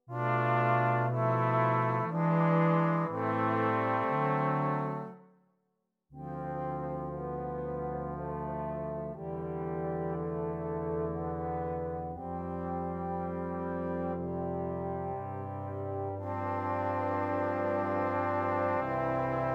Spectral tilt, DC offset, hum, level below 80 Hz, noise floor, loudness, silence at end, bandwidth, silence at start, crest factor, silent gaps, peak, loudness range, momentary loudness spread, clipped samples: -9.5 dB/octave; under 0.1%; none; -60 dBFS; -81 dBFS; -32 LUFS; 0 s; 5.6 kHz; 0.1 s; 16 dB; none; -16 dBFS; 8 LU; 10 LU; under 0.1%